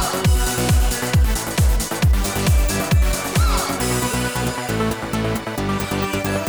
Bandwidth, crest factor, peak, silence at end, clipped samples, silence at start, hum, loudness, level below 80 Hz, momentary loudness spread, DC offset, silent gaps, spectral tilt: over 20 kHz; 10 dB; -8 dBFS; 0 s; under 0.1%; 0 s; none; -20 LUFS; -22 dBFS; 4 LU; under 0.1%; none; -4.5 dB/octave